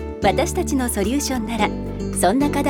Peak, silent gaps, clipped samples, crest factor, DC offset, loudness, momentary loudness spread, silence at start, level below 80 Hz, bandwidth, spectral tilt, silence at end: -2 dBFS; none; under 0.1%; 18 dB; under 0.1%; -21 LUFS; 5 LU; 0 s; -32 dBFS; 18.5 kHz; -4.5 dB/octave; 0 s